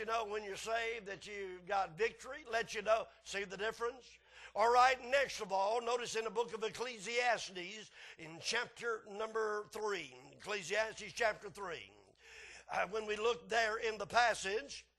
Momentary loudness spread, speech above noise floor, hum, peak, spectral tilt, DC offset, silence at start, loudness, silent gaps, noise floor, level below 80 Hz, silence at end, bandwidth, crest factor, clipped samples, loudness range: 16 LU; 21 dB; none; -16 dBFS; -2 dB/octave; under 0.1%; 0 s; -37 LUFS; none; -59 dBFS; -70 dBFS; 0.15 s; 12.5 kHz; 22 dB; under 0.1%; 6 LU